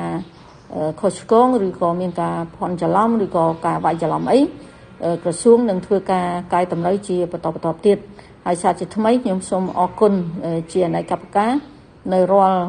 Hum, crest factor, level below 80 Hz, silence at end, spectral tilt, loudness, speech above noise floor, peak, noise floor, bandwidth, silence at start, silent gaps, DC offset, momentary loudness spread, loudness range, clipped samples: none; 18 dB; -52 dBFS; 0 s; -6.5 dB/octave; -19 LUFS; 23 dB; -2 dBFS; -41 dBFS; 10 kHz; 0 s; none; under 0.1%; 10 LU; 2 LU; under 0.1%